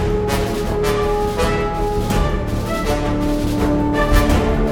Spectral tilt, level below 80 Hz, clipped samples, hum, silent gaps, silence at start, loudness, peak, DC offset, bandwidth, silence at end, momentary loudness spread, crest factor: -6 dB/octave; -22 dBFS; under 0.1%; none; none; 0 s; -19 LUFS; -2 dBFS; under 0.1%; 18.5 kHz; 0 s; 5 LU; 14 dB